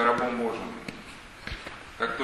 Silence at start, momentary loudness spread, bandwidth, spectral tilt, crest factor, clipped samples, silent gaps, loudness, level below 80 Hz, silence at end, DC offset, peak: 0 s; 15 LU; 13 kHz; -5 dB/octave; 22 dB; under 0.1%; none; -32 LUFS; -50 dBFS; 0 s; under 0.1%; -8 dBFS